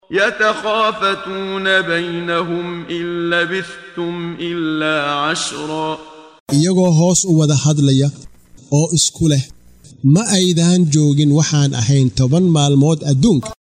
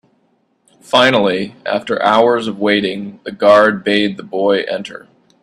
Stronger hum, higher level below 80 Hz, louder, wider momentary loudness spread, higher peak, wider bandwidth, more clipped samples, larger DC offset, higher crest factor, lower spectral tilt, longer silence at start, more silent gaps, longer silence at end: neither; first, -46 dBFS vs -58 dBFS; about the same, -15 LUFS vs -14 LUFS; about the same, 10 LU vs 12 LU; about the same, 0 dBFS vs 0 dBFS; first, 14 kHz vs 12 kHz; neither; neither; about the same, 14 dB vs 16 dB; about the same, -5 dB/octave vs -5 dB/octave; second, 0.1 s vs 0.9 s; first, 6.40-6.46 s vs none; second, 0.25 s vs 0.45 s